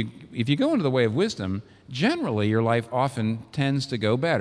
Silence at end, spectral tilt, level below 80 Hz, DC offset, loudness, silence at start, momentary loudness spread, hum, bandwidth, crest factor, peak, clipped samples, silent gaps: 0 s; -6.5 dB/octave; -64 dBFS; under 0.1%; -25 LUFS; 0 s; 8 LU; none; 11 kHz; 16 dB; -8 dBFS; under 0.1%; none